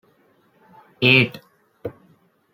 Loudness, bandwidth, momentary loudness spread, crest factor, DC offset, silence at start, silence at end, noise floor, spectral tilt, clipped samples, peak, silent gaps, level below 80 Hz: -16 LUFS; 16.5 kHz; 22 LU; 24 dB; under 0.1%; 1 s; 0.65 s; -60 dBFS; -6.5 dB/octave; under 0.1%; -2 dBFS; none; -62 dBFS